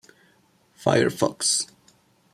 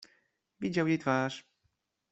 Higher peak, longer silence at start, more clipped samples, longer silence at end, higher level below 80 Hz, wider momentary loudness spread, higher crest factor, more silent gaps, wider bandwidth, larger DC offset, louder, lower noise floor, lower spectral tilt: first, -4 dBFS vs -14 dBFS; first, 0.8 s vs 0.6 s; neither; about the same, 0.7 s vs 0.7 s; first, -66 dBFS vs -72 dBFS; second, 6 LU vs 10 LU; about the same, 22 dB vs 20 dB; neither; first, 16 kHz vs 8.2 kHz; neither; first, -23 LUFS vs -31 LUFS; second, -61 dBFS vs -79 dBFS; second, -3 dB/octave vs -6.5 dB/octave